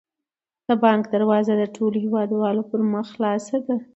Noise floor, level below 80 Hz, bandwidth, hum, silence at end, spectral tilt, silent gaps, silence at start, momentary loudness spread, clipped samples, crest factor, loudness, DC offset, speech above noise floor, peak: -87 dBFS; -70 dBFS; 8 kHz; none; 0.1 s; -7 dB/octave; none; 0.7 s; 6 LU; under 0.1%; 18 dB; -22 LUFS; under 0.1%; 66 dB; -4 dBFS